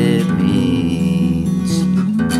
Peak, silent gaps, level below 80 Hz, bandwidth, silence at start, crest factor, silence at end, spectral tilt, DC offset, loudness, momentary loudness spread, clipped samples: -2 dBFS; none; -42 dBFS; 13.5 kHz; 0 s; 12 dB; 0 s; -7 dB/octave; under 0.1%; -16 LUFS; 2 LU; under 0.1%